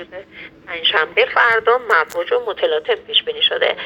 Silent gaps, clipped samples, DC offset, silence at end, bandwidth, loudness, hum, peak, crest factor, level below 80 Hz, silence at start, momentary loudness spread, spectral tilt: none; under 0.1%; under 0.1%; 0 s; 17.5 kHz; -16 LUFS; none; 0 dBFS; 18 dB; -60 dBFS; 0 s; 19 LU; -2 dB/octave